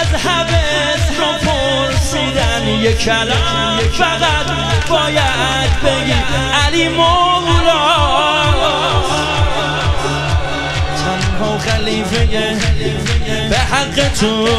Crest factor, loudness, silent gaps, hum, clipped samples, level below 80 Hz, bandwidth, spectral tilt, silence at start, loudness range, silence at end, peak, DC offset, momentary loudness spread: 14 dB; -14 LUFS; none; none; under 0.1%; -24 dBFS; 13.5 kHz; -4 dB/octave; 0 s; 4 LU; 0 s; 0 dBFS; under 0.1%; 5 LU